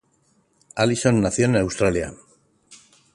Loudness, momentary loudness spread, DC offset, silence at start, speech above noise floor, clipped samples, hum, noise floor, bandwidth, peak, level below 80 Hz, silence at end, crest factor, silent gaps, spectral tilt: -21 LUFS; 11 LU; under 0.1%; 0.75 s; 44 dB; under 0.1%; none; -64 dBFS; 11.5 kHz; -4 dBFS; -46 dBFS; 0.4 s; 20 dB; none; -5.5 dB/octave